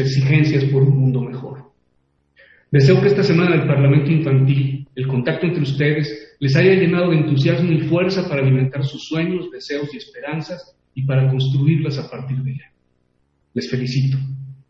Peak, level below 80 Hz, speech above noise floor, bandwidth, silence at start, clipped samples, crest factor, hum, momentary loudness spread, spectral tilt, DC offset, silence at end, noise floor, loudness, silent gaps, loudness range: -2 dBFS; -56 dBFS; 48 dB; 6.8 kHz; 0 s; under 0.1%; 14 dB; none; 13 LU; -8 dB/octave; under 0.1%; 0.15 s; -64 dBFS; -18 LUFS; none; 6 LU